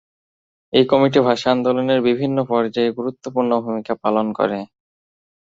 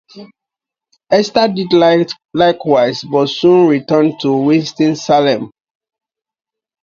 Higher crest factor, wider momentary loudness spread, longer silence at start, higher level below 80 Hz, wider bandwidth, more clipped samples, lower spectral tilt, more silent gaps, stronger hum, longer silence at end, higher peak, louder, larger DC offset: about the same, 18 dB vs 14 dB; first, 9 LU vs 5 LU; first, 0.75 s vs 0.15 s; about the same, -60 dBFS vs -56 dBFS; about the same, 7.8 kHz vs 7.4 kHz; neither; about the same, -6.5 dB/octave vs -6 dB/octave; neither; neither; second, 0.85 s vs 1.35 s; about the same, -2 dBFS vs 0 dBFS; second, -18 LUFS vs -13 LUFS; neither